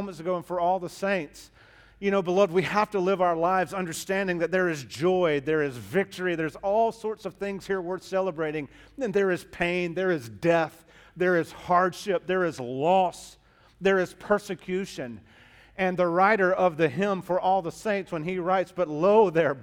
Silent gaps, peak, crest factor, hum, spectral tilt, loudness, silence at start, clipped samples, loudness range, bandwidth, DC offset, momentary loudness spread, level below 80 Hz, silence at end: none; -8 dBFS; 18 dB; none; -6 dB/octave; -26 LUFS; 0 s; under 0.1%; 4 LU; 16.5 kHz; under 0.1%; 9 LU; -60 dBFS; 0 s